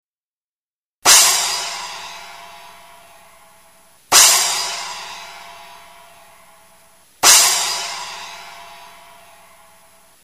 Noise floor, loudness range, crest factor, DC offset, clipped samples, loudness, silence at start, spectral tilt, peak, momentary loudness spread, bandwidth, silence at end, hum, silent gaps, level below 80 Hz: under -90 dBFS; 0 LU; 20 dB; under 0.1%; under 0.1%; -12 LUFS; 1.05 s; 2.5 dB/octave; 0 dBFS; 26 LU; 15.5 kHz; 1.5 s; none; none; -60 dBFS